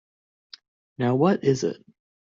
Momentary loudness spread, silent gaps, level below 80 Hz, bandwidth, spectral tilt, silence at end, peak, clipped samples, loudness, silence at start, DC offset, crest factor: 10 LU; none; -66 dBFS; 7.6 kHz; -7 dB/octave; 0.5 s; -8 dBFS; under 0.1%; -23 LUFS; 1 s; under 0.1%; 18 dB